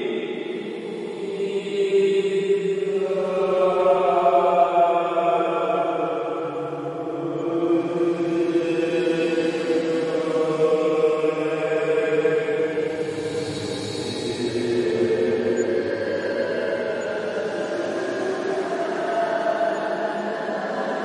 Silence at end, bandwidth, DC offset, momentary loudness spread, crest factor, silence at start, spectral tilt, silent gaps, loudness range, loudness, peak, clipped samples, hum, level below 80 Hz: 0 s; 11.5 kHz; under 0.1%; 9 LU; 16 dB; 0 s; -5.5 dB/octave; none; 5 LU; -23 LUFS; -6 dBFS; under 0.1%; none; -66 dBFS